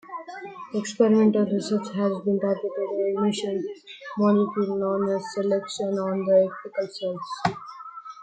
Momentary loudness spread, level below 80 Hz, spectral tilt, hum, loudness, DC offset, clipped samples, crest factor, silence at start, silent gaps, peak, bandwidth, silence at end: 16 LU; -70 dBFS; -6.5 dB/octave; none; -25 LUFS; under 0.1%; under 0.1%; 18 dB; 0.05 s; none; -6 dBFS; 9.2 kHz; 0 s